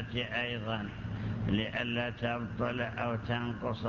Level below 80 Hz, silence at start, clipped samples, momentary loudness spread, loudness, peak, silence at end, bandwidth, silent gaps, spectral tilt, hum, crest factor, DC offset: -50 dBFS; 0 s; under 0.1%; 5 LU; -34 LUFS; -18 dBFS; 0 s; 7 kHz; none; -7.5 dB/octave; none; 18 dB; under 0.1%